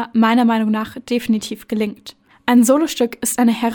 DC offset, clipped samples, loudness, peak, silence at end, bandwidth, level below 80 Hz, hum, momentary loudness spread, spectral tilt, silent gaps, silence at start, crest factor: under 0.1%; under 0.1%; -17 LUFS; -2 dBFS; 0 s; 18 kHz; -56 dBFS; none; 11 LU; -4 dB/octave; none; 0 s; 16 dB